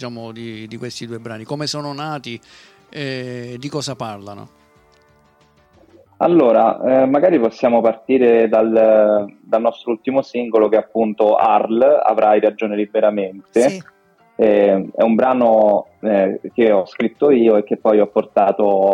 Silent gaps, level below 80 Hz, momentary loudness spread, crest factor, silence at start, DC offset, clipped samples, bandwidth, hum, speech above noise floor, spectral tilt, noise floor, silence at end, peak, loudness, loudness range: none; -64 dBFS; 16 LU; 14 dB; 0 s; under 0.1%; under 0.1%; 11 kHz; none; 38 dB; -6.5 dB/octave; -54 dBFS; 0 s; -4 dBFS; -16 LUFS; 13 LU